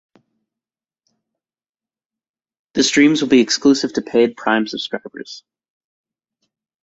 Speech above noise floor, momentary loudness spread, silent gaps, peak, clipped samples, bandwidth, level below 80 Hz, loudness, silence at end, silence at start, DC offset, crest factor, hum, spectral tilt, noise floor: over 74 dB; 20 LU; none; -2 dBFS; under 0.1%; 8.2 kHz; -60 dBFS; -16 LUFS; 1.45 s; 2.75 s; under 0.1%; 18 dB; none; -3.5 dB/octave; under -90 dBFS